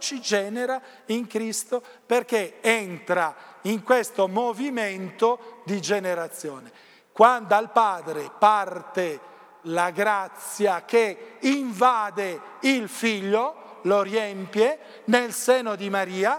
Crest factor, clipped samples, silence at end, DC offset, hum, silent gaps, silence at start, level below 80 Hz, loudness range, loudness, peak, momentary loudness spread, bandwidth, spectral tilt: 22 dB; under 0.1%; 0 s; under 0.1%; none; none; 0 s; -86 dBFS; 3 LU; -24 LUFS; -2 dBFS; 11 LU; 18 kHz; -3.5 dB/octave